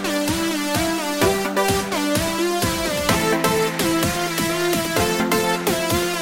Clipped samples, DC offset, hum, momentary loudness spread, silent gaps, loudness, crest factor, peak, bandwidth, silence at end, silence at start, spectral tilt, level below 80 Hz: under 0.1%; under 0.1%; none; 2 LU; none; -20 LUFS; 18 dB; -2 dBFS; 17 kHz; 0 s; 0 s; -3.5 dB/octave; -42 dBFS